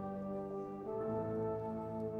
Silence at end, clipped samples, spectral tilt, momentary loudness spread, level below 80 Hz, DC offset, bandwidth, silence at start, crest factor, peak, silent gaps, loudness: 0 s; under 0.1%; -10.5 dB/octave; 4 LU; -64 dBFS; under 0.1%; 6.4 kHz; 0 s; 12 dB; -28 dBFS; none; -41 LUFS